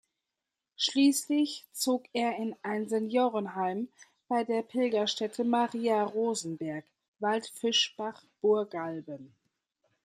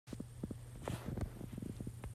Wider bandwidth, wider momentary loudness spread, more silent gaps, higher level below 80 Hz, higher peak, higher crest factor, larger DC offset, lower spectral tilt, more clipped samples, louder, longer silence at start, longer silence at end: about the same, 15 kHz vs 15 kHz; first, 11 LU vs 4 LU; first, 7.08-7.14 s vs none; second, -82 dBFS vs -54 dBFS; first, -14 dBFS vs -28 dBFS; about the same, 16 dB vs 18 dB; neither; second, -3.5 dB/octave vs -6.5 dB/octave; neither; first, -30 LUFS vs -46 LUFS; first, 0.8 s vs 0.05 s; first, 0.75 s vs 0 s